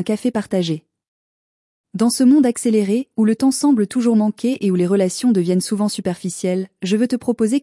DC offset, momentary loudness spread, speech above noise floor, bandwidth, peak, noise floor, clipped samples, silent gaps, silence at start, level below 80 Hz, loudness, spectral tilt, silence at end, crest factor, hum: under 0.1%; 8 LU; over 73 dB; 12 kHz; -6 dBFS; under -90 dBFS; under 0.1%; 1.08-1.84 s; 0 s; -64 dBFS; -18 LUFS; -6 dB/octave; 0.05 s; 12 dB; none